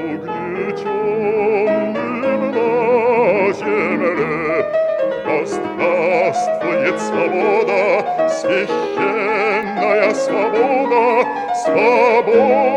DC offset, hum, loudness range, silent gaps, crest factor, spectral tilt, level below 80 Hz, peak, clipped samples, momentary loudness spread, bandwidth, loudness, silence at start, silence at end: under 0.1%; none; 2 LU; none; 14 dB; -5.5 dB/octave; -60 dBFS; -2 dBFS; under 0.1%; 6 LU; 10 kHz; -16 LUFS; 0 s; 0 s